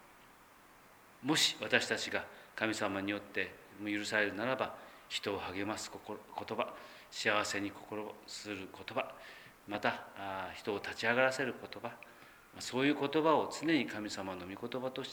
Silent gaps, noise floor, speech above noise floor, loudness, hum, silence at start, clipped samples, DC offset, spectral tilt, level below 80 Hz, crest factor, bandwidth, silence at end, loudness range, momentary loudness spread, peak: none; -61 dBFS; 24 dB; -36 LUFS; none; 0 s; under 0.1%; under 0.1%; -3 dB/octave; -74 dBFS; 26 dB; over 20 kHz; 0 s; 5 LU; 15 LU; -12 dBFS